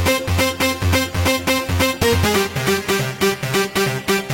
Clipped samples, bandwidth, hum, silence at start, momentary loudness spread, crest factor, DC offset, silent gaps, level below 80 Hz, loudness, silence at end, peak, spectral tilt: under 0.1%; 17 kHz; none; 0 s; 3 LU; 16 dB; under 0.1%; none; -36 dBFS; -18 LUFS; 0 s; -2 dBFS; -4 dB/octave